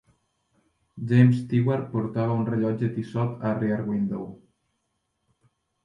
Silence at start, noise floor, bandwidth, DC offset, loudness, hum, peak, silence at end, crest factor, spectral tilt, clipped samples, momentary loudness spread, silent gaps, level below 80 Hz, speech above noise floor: 0.95 s; -76 dBFS; 5.8 kHz; under 0.1%; -25 LUFS; none; -8 dBFS; 1.5 s; 18 dB; -10 dB/octave; under 0.1%; 10 LU; none; -62 dBFS; 52 dB